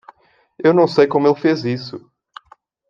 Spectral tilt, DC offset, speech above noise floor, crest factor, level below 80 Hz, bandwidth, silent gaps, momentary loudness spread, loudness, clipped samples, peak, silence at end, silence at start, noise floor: -7.5 dB/octave; under 0.1%; 36 dB; 16 dB; -64 dBFS; 7.4 kHz; none; 16 LU; -16 LUFS; under 0.1%; -2 dBFS; 0.9 s; 0.6 s; -52 dBFS